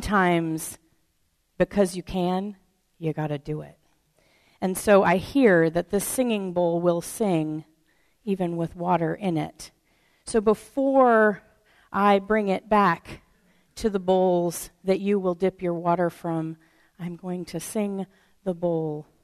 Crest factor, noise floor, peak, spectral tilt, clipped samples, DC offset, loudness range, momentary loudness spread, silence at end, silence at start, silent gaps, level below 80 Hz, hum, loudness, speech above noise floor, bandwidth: 18 dB; -70 dBFS; -6 dBFS; -6 dB/octave; under 0.1%; under 0.1%; 7 LU; 16 LU; 0.2 s; 0 s; none; -52 dBFS; none; -24 LUFS; 46 dB; 13.5 kHz